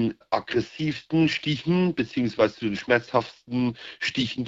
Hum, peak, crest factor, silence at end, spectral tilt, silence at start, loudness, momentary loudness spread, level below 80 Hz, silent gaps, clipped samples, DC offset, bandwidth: none; -6 dBFS; 20 dB; 0 s; -6 dB/octave; 0 s; -25 LUFS; 7 LU; -58 dBFS; none; under 0.1%; under 0.1%; 7.8 kHz